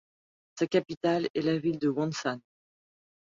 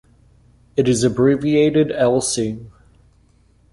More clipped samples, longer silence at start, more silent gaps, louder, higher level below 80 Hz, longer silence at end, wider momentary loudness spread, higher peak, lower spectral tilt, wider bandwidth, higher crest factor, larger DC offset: neither; second, 0.55 s vs 0.75 s; first, 0.97-1.01 s, 1.30-1.34 s vs none; second, -30 LUFS vs -17 LUFS; second, -70 dBFS vs -50 dBFS; about the same, 0.95 s vs 1.05 s; second, 6 LU vs 10 LU; second, -12 dBFS vs -4 dBFS; about the same, -6 dB/octave vs -5.5 dB/octave; second, 7.6 kHz vs 11.5 kHz; about the same, 20 dB vs 16 dB; neither